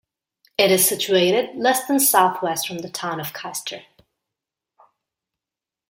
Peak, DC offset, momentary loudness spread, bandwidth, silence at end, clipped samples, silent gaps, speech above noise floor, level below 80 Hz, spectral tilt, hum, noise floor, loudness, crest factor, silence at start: -2 dBFS; under 0.1%; 13 LU; 17 kHz; 2.1 s; under 0.1%; none; 69 dB; -70 dBFS; -2.5 dB/octave; none; -89 dBFS; -19 LUFS; 20 dB; 0.6 s